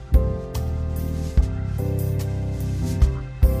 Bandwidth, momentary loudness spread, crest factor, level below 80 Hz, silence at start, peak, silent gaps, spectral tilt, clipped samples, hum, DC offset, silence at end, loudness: 15.5 kHz; 5 LU; 16 dB; -24 dBFS; 0 s; -6 dBFS; none; -8 dB/octave; under 0.1%; none; under 0.1%; 0 s; -24 LUFS